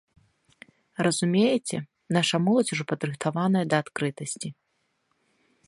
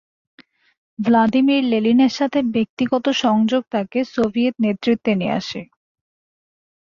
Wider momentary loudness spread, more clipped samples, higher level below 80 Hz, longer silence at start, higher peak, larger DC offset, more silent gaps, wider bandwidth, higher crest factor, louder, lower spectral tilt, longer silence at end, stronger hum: first, 11 LU vs 7 LU; neither; second, -70 dBFS vs -60 dBFS; about the same, 1 s vs 1 s; about the same, -6 dBFS vs -6 dBFS; neither; second, none vs 2.69-2.77 s; first, 11.5 kHz vs 7.2 kHz; first, 20 dB vs 14 dB; second, -26 LUFS vs -18 LUFS; about the same, -5 dB/octave vs -6 dB/octave; about the same, 1.15 s vs 1.2 s; neither